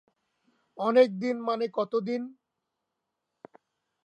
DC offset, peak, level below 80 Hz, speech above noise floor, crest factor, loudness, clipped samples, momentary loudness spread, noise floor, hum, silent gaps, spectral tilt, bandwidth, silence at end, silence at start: under 0.1%; -10 dBFS; -86 dBFS; 57 dB; 20 dB; -27 LUFS; under 0.1%; 12 LU; -84 dBFS; none; none; -6.5 dB/octave; 7.8 kHz; 1.75 s; 0.75 s